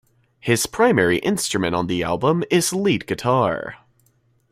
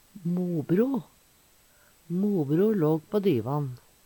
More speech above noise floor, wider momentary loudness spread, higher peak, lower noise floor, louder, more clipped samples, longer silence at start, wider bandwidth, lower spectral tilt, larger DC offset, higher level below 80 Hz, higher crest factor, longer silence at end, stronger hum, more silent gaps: first, 42 dB vs 35 dB; about the same, 6 LU vs 8 LU; first, -4 dBFS vs -12 dBFS; about the same, -62 dBFS vs -61 dBFS; first, -20 LUFS vs -27 LUFS; neither; first, 0.45 s vs 0.15 s; second, 16 kHz vs 18 kHz; second, -4.5 dB/octave vs -9 dB/octave; neither; first, -52 dBFS vs -68 dBFS; about the same, 18 dB vs 14 dB; first, 0.75 s vs 0.3 s; neither; neither